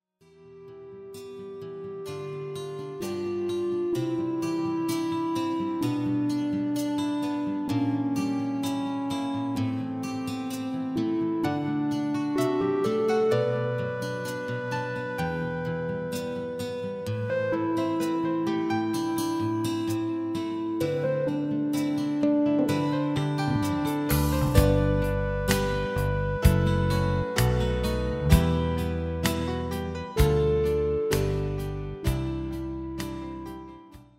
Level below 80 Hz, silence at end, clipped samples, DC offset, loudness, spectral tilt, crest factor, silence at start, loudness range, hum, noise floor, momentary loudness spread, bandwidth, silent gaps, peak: -38 dBFS; 0.15 s; under 0.1%; under 0.1%; -27 LUFS; -6.5 dB/octave; 20 dB; 0.4 s; 6 LU; none; -55 dBFS; 10 LU; 16 kHz; none; -6 dBFS